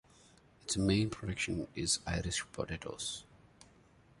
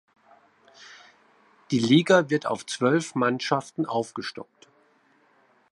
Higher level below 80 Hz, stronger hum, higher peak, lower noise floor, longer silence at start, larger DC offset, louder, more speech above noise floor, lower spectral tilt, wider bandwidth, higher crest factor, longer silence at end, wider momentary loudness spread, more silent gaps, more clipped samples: first, -52 dBFS vs -74 dBFS; neither; second, -18 dBFS vs -6 dBFS; about the same, -64 dBFS vs -63 dBFS; second, 0.65 s vs 0.8 s; neither; second, -36 LUFS vs -24 LUFS; second, 28 dB vs 39 dB; about the same, -4 dB/octave vs -5 dB/octave; about the same, 11.5 kHz vs 11.5 kHz; about the same, 20 dB vs 22 dB; second, 0.95 s vs 1.3 s; second, 9 LU vs 16 LU; neither; neither